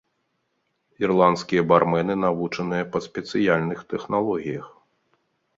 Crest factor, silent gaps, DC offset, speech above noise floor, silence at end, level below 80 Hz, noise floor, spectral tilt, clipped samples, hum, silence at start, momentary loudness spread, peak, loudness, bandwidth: 22 dB; none; under 0.1%; 51 dB; 0.9 s; -60 dBFS; -73 dBFS; -7 dB/octave; under 0.1%; none; 1 s; 10 LU; -2 dBFS; -23 LUFS; 7.8 kHz